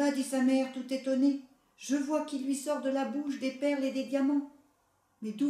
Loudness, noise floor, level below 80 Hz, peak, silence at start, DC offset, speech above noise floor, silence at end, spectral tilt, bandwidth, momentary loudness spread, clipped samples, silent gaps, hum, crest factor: -31 LUFS; -72 dBFS; -82 dBFS; -16 dBFS; 0 s; under 0.1%; 41 dB; 0 s; -4 dB/octave; 14 kHz; 9 LU; under 0.1%; none; none; 14 dB